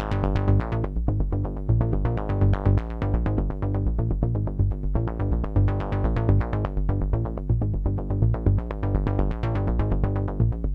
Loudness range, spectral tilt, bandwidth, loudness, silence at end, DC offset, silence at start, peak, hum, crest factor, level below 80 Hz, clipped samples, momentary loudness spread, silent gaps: 1 LU; -10.5 dB/octave; 4.5 kHz; -25 LUFS; 0 s; under 0.1%; 0 s; -8 dBFS; none; 16 dB; -28 dBFS; under 0.1%; 4 LU; none